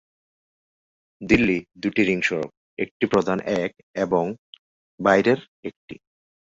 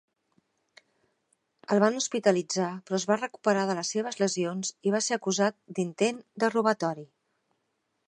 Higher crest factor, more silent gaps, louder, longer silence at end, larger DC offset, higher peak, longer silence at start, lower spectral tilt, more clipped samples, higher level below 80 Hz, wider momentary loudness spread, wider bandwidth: about the same, 22 dB vs 22 dB; first, 2.57-2.77 s, 2.91-3.00 s, 3.83-3.94 s, 4.38-4.53 s, 4.59-4.98 s, 5.48-5.63 s, 5.77-5.88 s vs none; first, -22 LUFS vs -28 LUFS; second, 0.65 s vs 1.05 s; neither; first, -2 dBFS vs -8 dBFS; second, 1.2 s vs 1.7 s; first, -6 dB/octave vs -4 dB/octave; neither; first, -50 dBFS vs -80 dBFS; first, 18 LU vs 6 LU; second, 7.8 kHz vs 10.5 kHz